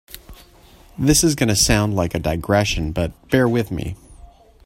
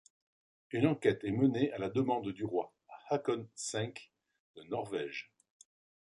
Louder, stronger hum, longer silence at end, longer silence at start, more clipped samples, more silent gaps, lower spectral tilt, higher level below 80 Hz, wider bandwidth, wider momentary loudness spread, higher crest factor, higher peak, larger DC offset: first, -18 LUFS vs -35 LUFS; neither; second, 0.4 s vs 0.9 s; second, 0.1 s vs 0.7 s; neither; second, none vs 4.40-4.54 s; second, -4 dB/octave vs -6 dB/octave; first, -34 dBFS vs -70 dBFS; first, 16.5 kHz vs 11.5 kHz; about the same, 15 LU vs 14 LU; about the same, 20 dB vs 22 dB; first, 0 dBFS vs -14 dBFS; neither